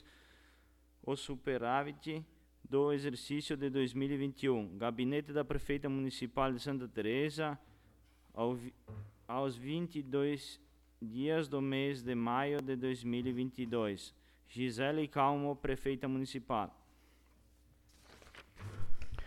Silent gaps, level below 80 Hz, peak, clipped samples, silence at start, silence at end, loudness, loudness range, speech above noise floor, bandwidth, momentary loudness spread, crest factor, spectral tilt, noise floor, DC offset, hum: none; -56 dBFS; -20 dBFS; under 0.1%; 0.05 s; 0 s; -37 LUFS; 4 LU; 30 dB; 14.5 kHz; 15 LU; 18 dB; -6.5 dB/octave; -67 dBFS; under 0.1%; none